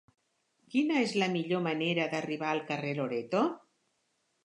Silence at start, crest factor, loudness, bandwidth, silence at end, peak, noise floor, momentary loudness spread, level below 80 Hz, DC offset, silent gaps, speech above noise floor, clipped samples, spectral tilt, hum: 0.7 s; 18 dB; -31 LUFS; 11 kHz; 0.85 s; -14 dBFS; -77 dBFS; 5 LU; -84 dBFS; under 0.1%; none; 46 dB; under 0.1%; -5.5 dB/octave; none